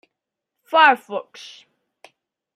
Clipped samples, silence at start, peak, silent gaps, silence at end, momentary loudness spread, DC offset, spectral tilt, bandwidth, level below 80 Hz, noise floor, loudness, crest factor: under 0.1%; 0.7 s; -2 dBFS; none; 1.35 s; 25 LU; under 0.1%; -2.5 dB/octave; 14.5 kHz; -84 dBFS; -83 dBFS; -17 LUFS; 22 dB